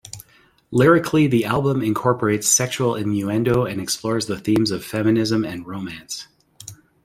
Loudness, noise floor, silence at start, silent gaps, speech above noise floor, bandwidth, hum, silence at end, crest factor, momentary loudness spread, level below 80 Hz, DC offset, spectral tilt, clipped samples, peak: -19 LUFS; -50 dBFS; 0.05 s; none; 30 dB; 16 kHz; none; 0.3 s; 18 dB; 16 LU; -52 dBFS; under 0.1%; -4.5 dB/octave; under 0.1%; -2 dBFS